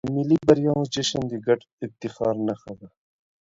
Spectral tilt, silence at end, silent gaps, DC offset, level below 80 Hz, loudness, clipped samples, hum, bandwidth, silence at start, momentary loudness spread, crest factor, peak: -6 dB/octave; 0.55 s; 1.72-1.78 s; under 0.1%; -56 dBFS; -23 LUFS; under 0.1%; none; 7.8 kHz; 0.05 s; 17 LU; 22 dB; -2 dBFS